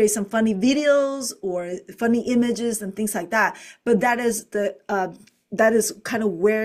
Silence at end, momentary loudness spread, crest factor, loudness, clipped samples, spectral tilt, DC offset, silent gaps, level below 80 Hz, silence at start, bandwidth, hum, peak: 0 s; 9 LU; 16 dB; -22 LUFS; under 0.1%; -4 dB/octave; under 0.1%; none; -62 dBFS; 0 s; 16 kHz; none; -6 dBFS